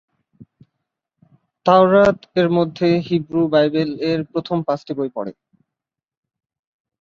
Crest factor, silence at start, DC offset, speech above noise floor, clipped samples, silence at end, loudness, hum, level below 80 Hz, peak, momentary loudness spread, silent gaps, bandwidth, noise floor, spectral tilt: 18 dB; 1.65 s; under 0.1%; 69 dB; under 0.1%; 1.7 s; -18 LUFS; none; -58 dBFS; -2 dBFS; 11 LU; none; 7.2 kHz; -86 dBFS; -8 dB/octave